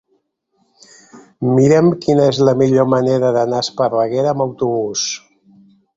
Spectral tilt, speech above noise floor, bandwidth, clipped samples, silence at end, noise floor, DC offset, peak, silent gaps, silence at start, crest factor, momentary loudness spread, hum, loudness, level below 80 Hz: -6 dB/octave; 51 dB; 7.8 kHz; under 0.1%; 0.8 s; -65 dBFS; under 0.1%; -2 dBFS; none; 1.15 s; 14 dB; 8 LU; none; -15 LUFS; -56 dBFS